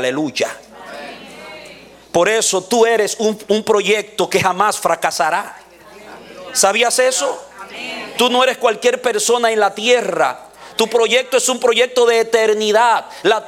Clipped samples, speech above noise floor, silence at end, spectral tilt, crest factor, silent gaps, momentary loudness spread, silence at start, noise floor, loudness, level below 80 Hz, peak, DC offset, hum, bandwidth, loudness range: under 0.1%; 25 dB; 0 s; -2 dB/octave; 16 dB; none; 19 LU; 0 s; -40 dBFS; -15 LUFS; -60 dBFS; 0 dBFS; under 0.1%; none; 16.5 kHz; 3 LU